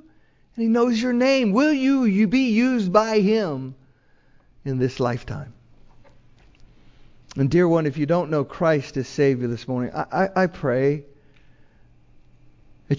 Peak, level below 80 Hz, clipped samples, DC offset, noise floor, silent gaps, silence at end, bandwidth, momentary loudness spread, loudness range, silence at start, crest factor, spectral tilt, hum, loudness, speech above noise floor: -4 dBFS; -52 dBFS; under 0.1%; under 0.1%; -56 dBFS; none; 0 s; 7.6 kHz; 12 LU; 10 LU; 0.55 s; 20 dB; -7 dB/octave; none; -21 LUFS; 36 dB